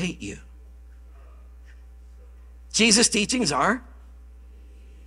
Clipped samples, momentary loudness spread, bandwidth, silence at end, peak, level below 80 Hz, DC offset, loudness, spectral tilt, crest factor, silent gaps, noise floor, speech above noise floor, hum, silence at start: under 0.1%; 21 LU; 14.5 kHz; 0 s; -2 dBFS; -46 dBFS; under 0.1%; -20 LUFS; -2.5 dB/octave; 24 dB; none; -45 dBFS; 23 dB; none; 0 s